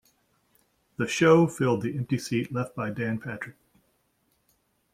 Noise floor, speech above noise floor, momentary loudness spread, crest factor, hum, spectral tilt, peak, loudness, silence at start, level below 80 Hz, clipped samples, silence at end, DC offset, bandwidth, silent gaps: -71 dBFS; 46 dB; 17 LU; 20 dB; none; -6 dB/octave; -8 dBFS; -26 LUFS; 1 s; -66 dBFS; under 0.1%; 1.45 s; under 0.1%; 15.5 kHz; none